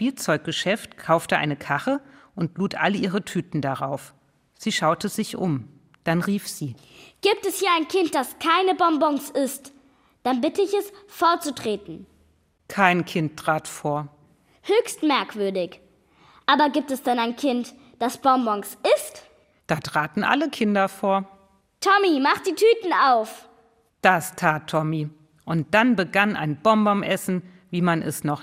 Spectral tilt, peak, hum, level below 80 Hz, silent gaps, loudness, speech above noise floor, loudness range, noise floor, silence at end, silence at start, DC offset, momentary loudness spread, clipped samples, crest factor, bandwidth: -5 dB/octave; -2 dBFS; none; -66 dBFS; none; -23 LUFS; 40 dB; 5 LU; -62 dBFS; 0 s; 0 s; under 0.1%; 11 LU; under 0.1%; 22 dB; 16 kHz